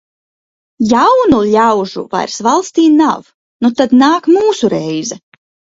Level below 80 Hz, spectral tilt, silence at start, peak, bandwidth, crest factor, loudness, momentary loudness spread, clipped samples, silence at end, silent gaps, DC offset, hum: -48 dBFS; -5 dB/octave; 0.8 s; 0 dBFS; 7.8 kHz; 12 dB; -11 LUFS; 10 LU; under 0.1%; 0.6 s; 3.34-3.59 s; under 0.1%; none